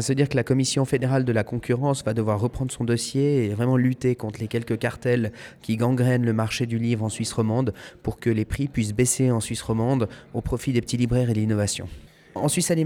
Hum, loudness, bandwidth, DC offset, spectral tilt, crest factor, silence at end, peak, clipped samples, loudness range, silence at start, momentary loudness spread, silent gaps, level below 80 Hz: none; -24 LUFS; 16.5 kHz; under 0.1%; -5.5 dB/octave; 16 dB; 0 s; -8 dBFS; under 0.1%; 1 LU; 0 s; 8 LU; none; -46 dBFS